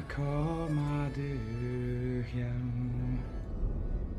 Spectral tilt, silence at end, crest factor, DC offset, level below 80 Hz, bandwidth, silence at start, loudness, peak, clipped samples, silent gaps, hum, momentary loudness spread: -8.5 dB/octave; 0 s; 14 dB; under 0.1%; -40 dBFS; 10 kHz; 0 s; -35 LUFS; -20 dBFS; under 0.1%; none; none; 5 LU